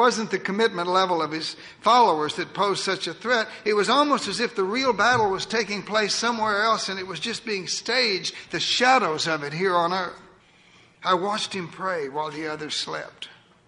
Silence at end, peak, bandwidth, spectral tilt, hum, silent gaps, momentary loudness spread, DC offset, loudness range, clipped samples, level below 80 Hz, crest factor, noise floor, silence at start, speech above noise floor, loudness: 0.35 s; -6 dBFS; 11 kHz; -3 dB/octave; none; none; 10 LU; under 0.1%; 5 LU; under 0.1%; -64 dBFS; 18 dB; -55 dBFS; 0 s; 31 dB; -23 LUFS